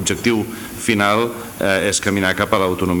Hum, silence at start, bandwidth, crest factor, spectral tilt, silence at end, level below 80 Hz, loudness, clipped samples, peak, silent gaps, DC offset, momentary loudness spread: none; 0 s; over 20 kHz; 18 dB; -4 dB/octave; 0 s; -46 dBFS; -18 LUFS; under 0.1%; 0 dBFS; none; under 0.1%; 7 LU